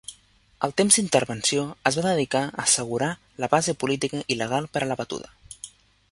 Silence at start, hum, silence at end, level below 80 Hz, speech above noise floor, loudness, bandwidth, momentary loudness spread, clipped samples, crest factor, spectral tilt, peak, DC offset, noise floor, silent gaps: 0.1 s; none; 0.45 s; -60 dBFS; 33 dB; -23 LUFS; 11.5 kHz; 20 LU; under 0.1%; 24 dB; -3 dB/octave; -2 dBFS; under 0.1%; -57 dBFS; none